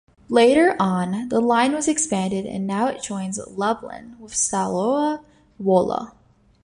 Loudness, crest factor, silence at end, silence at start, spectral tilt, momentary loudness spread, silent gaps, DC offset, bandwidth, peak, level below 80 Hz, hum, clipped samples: -21 LUFS; 18 dB; 0.55 s; 0.3 s; -4.5 dB/octave; 12 LU; none; under 0.1%; 11.5 kHz; -2 dBFS; -56 dBFS; none; under 0.1%